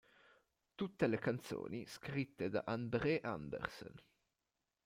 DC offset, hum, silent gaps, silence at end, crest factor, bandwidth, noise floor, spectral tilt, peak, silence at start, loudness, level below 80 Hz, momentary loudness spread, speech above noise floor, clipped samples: under 0.1%; none; none; 0.85 s; 22 dB; 16.5 kHz; -90 dBFS; -6.5 dB/octave; -20 dBFS; 0.8 s; -41 LUFS; -70 dBFS; 10 LU; 49 dB; under 0.1%